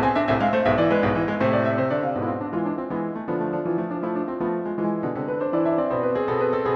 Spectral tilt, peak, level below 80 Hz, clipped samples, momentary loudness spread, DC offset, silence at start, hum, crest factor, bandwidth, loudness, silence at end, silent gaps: -9 dB/octave; -8 dBFS; -50 dBFS; under 0.1%; 7 LU; under 0.1%; 0 s; none; 16 dB; 6.4 kHz; -24 LUFS; 0 s; none